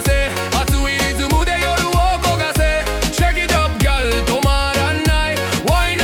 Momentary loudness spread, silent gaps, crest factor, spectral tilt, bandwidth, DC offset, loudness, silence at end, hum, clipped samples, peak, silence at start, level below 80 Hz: 2 LU; none; 14 dB; -4 dB/octave; 18 kHz; under 0.1%; -16 LUFS; 0 s; none; under 0.1%; -2 dBFS; 0 s; -20 dBFS